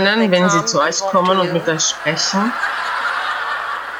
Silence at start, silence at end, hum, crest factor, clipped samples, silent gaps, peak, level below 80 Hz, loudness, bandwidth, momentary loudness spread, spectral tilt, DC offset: 0 s; 0 s; none; 14 dB; under 0.1%; none; -2 dBFS; -58 dBFS; -16 LUFS; over 20 kHz; 6 LU; -3 dB/octave; under 0.1%